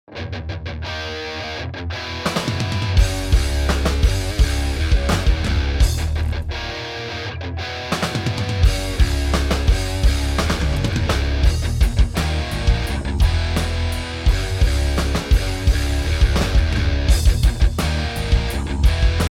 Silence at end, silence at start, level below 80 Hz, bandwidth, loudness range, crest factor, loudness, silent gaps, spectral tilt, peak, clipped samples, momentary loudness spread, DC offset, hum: 0.05 s; 0.1 s; -20 dBFS; 16 kHz; 3 LU; 16 dB; -21 LUFS; none; -5 dB/octave; -2 dBFS; under 0.1%; 8 LU; under 0.1%; none